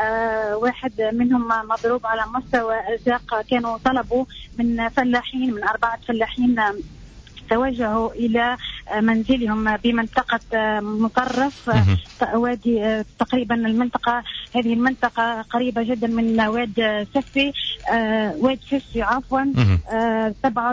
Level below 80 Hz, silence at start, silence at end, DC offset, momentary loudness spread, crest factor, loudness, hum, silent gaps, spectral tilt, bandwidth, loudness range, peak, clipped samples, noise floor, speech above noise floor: -40 dBFS; 0 s; 0 s; under 0.1%; 5 LU; 14 dB; -21 LUFS; none; none; -7 dB/octave; 7.6 kHz; 1 LU; -6 dBFS; under 0.1%; -41 dBFS; 21 dB